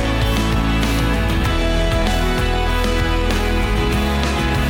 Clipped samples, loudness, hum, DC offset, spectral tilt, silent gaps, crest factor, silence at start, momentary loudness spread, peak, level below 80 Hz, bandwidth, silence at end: under 0.1%; -18 LUFS; none; under 0.1%; -5.5 dB/octave; none; 10 dB; 0 s; 1 LU; -6 dBFS; -20 dBFS; 17.5 kHz; 0 s